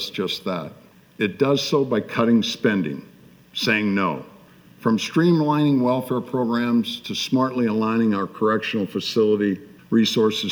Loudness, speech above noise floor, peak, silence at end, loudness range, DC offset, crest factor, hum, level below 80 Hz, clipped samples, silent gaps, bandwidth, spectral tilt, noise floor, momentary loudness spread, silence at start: -21 LUFS; 28 dB; -6 dBFS; 0 s; 2 LU; under 0.1%; 16 dB; none; -66 dBFS; under 0.1%; none; over 20 kHz; -5.5 dB/octave; -49 dBFS; 8 LU; 0 s